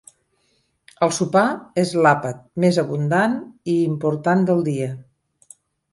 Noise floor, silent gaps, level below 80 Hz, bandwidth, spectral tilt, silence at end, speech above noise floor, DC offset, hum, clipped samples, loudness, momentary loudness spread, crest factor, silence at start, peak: -66 dBFS; none; -62 dBFS; 11.5 kHz; -6 dB/octave; 0.9 s; 47 dB; under 0.1%; none; under 0.1%; -20 LUFS; 9 LU; 18 dB; 1 s; -4 dBFS